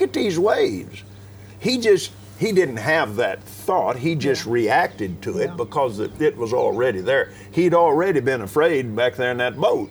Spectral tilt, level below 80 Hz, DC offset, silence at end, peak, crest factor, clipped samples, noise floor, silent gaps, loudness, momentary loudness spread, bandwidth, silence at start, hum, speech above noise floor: -5.5 dB/octave; -56 dBFS; under 0.1%; 0 s; -4 dBFS; 16 dB; under 0.1%; -41 dBFS; none; -21 LUFS; 8 LU; over 20 kHz; 0 s; none; 21 dB